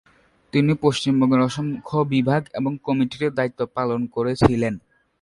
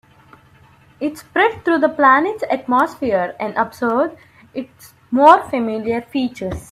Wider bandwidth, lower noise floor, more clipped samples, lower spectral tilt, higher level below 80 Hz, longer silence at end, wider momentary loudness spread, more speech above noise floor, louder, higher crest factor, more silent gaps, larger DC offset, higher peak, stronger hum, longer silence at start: second, 11.5 kHz vs 14.5 kHz; about the same, -48 dBFS vs -49 dBFS; neither; first, -7 dB/octave vs -5.5 dB/octave; about the same, -48 dBFS vs -50 dBFS; first, 0.45 s vs 0.1 s; second, 7 LU vs 15 LU; second, 27 dB vs 32 dB; second, -22 LUFS vs -17 LUFS; about the same, 20 dB vs 18 dB; neither; neither; about the same, -2 dBFS vs 0 dBFS; neither; second, 0.55 s vs 1 s